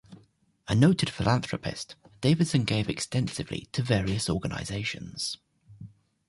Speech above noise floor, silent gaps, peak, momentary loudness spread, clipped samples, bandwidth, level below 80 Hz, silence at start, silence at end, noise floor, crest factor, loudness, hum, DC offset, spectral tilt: 35 dB; none; -10 dBFS; 12 LU; under 0.1%; 11.5 kHz; -50 dBFS; 0.1 s; 0.4 s; -62 dBFS; 20 dB; -28 LUFS; none; under 0.1%; -5.5 dB/octave